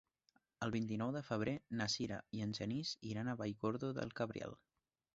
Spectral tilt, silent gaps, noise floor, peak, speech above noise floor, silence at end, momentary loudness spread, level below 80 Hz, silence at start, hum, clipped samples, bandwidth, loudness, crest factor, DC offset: -5 dB/octave; none; -79 dBFS; -24 dBFS; 37 dB; 0.6 s; 4 LU; -72 dBFS; 0.6 s; none; under 0.1%; 8 kHz; -42 LUFS; 18 dB; under 0.1%